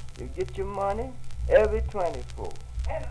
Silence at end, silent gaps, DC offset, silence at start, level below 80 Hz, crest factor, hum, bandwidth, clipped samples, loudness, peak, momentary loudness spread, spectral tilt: 0 s; none; under 0.1%; 0 s; -36 dBFS; 22 dB; none; 11 kHz; under 0.1%; -28 LUFS; -6 dBFS; 16 LU; -6.5 dB/octave